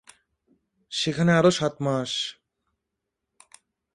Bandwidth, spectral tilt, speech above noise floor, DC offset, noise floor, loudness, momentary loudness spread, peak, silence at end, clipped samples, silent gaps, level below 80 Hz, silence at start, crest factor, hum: 11.5 kHz; -5 dB/octave; 60 dB; under 0.1%; -83 dBFS; -24 LUFS; 11 LU; -6 dBFS; 1.6 s; under 0.1%; none; -62 dBFS; 0.9 s; 20 dB; none